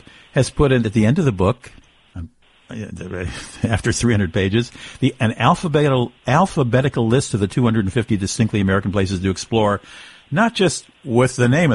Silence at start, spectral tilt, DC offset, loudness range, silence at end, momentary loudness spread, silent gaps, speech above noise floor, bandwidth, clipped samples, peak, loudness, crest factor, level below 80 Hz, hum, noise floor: 0.35 s; -6 dB/octave; under 0.1%; 5 LU; 0 s; 14 LU; none; 21 dB; 11.5 kHz; under 0.1%; -2 dBFS; -18 LUFS; 16 dB; -40 dBFS; none; -39 dBFS